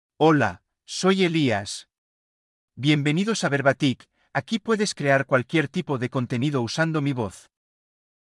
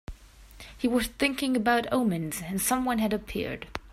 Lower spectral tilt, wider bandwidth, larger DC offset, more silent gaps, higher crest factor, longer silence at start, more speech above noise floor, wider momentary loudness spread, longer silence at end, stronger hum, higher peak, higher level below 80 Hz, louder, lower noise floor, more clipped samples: first, -5.5 dB/octave vs -4 dB/octave; second, 12 kHz vs 16 kHz; neither; first, 1.98-2.68 s vs none; about the same, 18 dB vs 18 dB; about the same, 0.2 s vs 0.1 s; first, over 67 dB vs 22 dB; about the same, 10 LU vs 12 LU; first, 0.9 s vs 0 s; neither; first, -6 dBFS vs -12 dBFS; second, -70 dBFS vs -48 dBFS; first, -23 LUFS vs -28 LUFS; first, under -90 dBFS vs -50 dBFS; neither